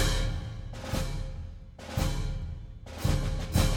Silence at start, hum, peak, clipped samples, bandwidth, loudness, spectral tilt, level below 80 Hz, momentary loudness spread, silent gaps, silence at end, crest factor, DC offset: 0 s; none; -12 dBFS; under 0.1%; 17 kHz; -33 LUFS; -5 dB/octave; -34 dBFS; 14 LU; none; 0 s; 18 dB; under 0.1%